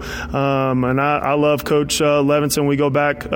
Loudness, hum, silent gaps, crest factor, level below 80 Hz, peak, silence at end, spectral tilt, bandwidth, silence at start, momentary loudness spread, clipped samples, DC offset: -17 LUFS; none; none; 12 dB; -40 dBFS; -6 dBFS; 0 s; -5 dB/octave; 17 kHz; 0 s; 3 LU; under 0.1%; under 0.1%